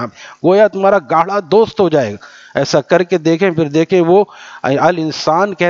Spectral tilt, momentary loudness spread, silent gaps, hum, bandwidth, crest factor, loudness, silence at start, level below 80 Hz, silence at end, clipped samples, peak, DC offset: -6 dB/octave; 10 LU; none; none; 7.6 kHz; 12 dB; -13 LUFS; 0 s; -56 dBFS; 0 s; under 0.1%; 0 dBFS; under 0.1%